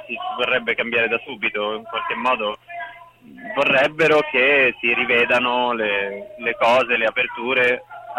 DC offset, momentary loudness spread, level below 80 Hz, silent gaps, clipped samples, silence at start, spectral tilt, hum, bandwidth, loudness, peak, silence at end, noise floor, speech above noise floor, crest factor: under 0.1%; 11 LU; -60 dBFS; none; under 0.1%; 0 s; -4.5 dB/octave; none; 12.5 kHz; -19 LUFS; -6 dBFS; 0 s; -43 dBFS; 24 dB; 14 dB